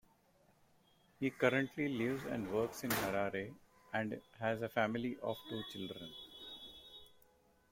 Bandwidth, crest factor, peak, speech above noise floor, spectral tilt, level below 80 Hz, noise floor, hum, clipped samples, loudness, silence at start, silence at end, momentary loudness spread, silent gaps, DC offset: 16.5 kHz; 24 dB; -18 dBFS; 33 dB; -5 dB/octave; -70 dBFS; -71 dBFS; none; under 0.1%; -39 LUFS; 1.2 s; 0.65 s; 15 LU; none; under 0.1%